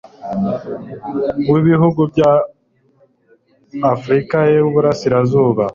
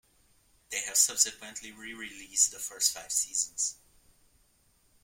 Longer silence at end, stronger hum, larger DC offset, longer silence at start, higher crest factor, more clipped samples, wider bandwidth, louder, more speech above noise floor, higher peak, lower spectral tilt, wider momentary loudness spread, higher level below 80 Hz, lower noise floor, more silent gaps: second, 0 s vs 1.3 s; neither; neither; second, 0.2 s vs 0.7 s; second, 14 dB vs 24 dB; neither; second, 7.4 kHz vs 16.5 kHz; first, -15 LUFS vs -27 LUFS; first, 41 dB vs 36 dB; first, -2 dBFS vs -8 dBFS; first, -8.5 dB/octave vs 2 dB/octave; second, 12 LU vs 17 LU; first, -50 dBFS vs -68 dBFS; second, -55 dBFS vs -68 dBFS; neither